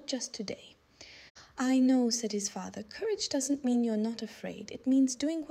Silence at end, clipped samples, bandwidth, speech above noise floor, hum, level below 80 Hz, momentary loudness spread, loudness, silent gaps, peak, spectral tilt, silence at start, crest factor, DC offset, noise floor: 0 s; under 0.1%; 14 kHz; 24 dB; none; -72 dBFS; 19 LU; -31 LUFS; 1.30-1.35 s; -18 dBFS; -3.5 dB/octave; 0 s; 14 dB; under 0.1%; -54 dBFS